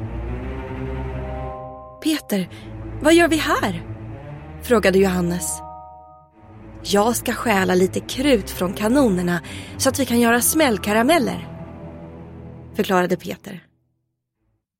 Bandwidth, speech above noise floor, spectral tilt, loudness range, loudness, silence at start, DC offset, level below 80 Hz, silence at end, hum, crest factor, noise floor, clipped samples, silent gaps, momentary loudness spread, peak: 16.5 kHz; 55 dB; -4.5 dB/octave; 4 LU; -20 LUFS; 0 s; under 0.1%; -38 dBFS; 1.2 s; none; 16 dB; -73 dBFS; under 0.1%; none; 20 LU; -4 dBFS